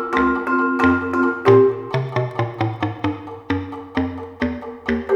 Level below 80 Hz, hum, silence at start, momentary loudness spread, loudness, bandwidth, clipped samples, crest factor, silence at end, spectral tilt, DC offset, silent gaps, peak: -46 dBFS; none; 0 s; 12 LU; -20 LUFS; 7.2 kHz; under 0.1%; 18 dB; 0 s; -8 dB/octave; under 0.1%; none; -2 dBFS